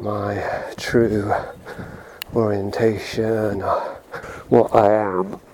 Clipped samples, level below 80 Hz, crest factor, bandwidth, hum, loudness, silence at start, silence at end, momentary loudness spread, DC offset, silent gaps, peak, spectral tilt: under 0.1%; -48 dBFS; 20 dB; 19 kHz; none; -20 LUFS; 0 s; 0.15 s; 18 LU; under 0.1%; none; 0 dBFS; -6.5 dB/octave